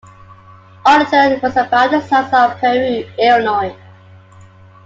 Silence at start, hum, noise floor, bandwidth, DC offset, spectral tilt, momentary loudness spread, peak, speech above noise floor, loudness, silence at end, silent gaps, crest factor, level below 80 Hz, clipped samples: 0.85 s; none; -41 dBFS; 7.8 kHz; under 0.1%; -5 dB/octave; 7 LU; 0 dBFS; 28 dB; -13 LUFS; 1.1 s; none; 14 dB; -56 dBFS; under 0.1%